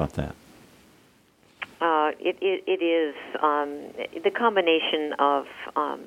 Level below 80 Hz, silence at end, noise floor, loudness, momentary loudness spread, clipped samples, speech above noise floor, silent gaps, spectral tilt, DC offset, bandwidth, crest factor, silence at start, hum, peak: -52 dBFS; 0 s; -59 dBFS; -25 LUFS; 12 LU; under 0.1%; 34 dB; none; -6 dB/octave; under 0.1%; 14.5 kHz; 20 dB; 0 s; none; -8 dBFS